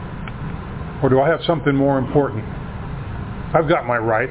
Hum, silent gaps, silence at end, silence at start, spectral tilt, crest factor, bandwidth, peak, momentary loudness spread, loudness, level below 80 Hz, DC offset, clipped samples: none; none; 0 s; 0 s; -11 dB/octave; 18 dB; 4 kHz; -2 dBFS; 13 LU; -20 LUFS; -36 dBFS; under 0.1%; under 0.1%